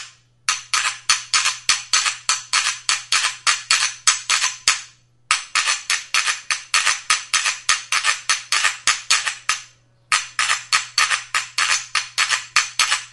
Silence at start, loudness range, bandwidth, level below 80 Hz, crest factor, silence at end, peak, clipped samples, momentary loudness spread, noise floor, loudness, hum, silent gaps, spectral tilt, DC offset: 0 s; 2 LU; 12 kHz; -62 dBFS; 22 dB; 0.05 s; 0 dBFS; under 0.1%; 5 LU; -49 dBFS; -18 LUFS; none; none; 3.5 dB/octave; under 0.1%